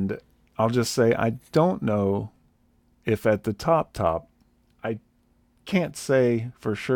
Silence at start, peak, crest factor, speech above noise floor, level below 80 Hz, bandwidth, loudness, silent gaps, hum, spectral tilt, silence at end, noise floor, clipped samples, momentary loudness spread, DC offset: 0 s; -8 dBFS; 18 dB; 40 dB; -54 dBFS; 18 kHz; -25 LUFS; none; none; -6 dB/octave; 0 s; -64 dBFS; under 0.1%; 13 LU; under 0.1%